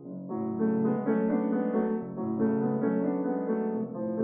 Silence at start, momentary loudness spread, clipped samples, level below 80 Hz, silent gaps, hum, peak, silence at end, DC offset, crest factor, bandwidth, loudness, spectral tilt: 0 s; 6 LU; under 0.1%; -76 dBFS; none; none; -14 dBFS; 0 s; under 0.1%; 14 dB; 2.8 kHz; -29 LUFS; -10.5 dB/octave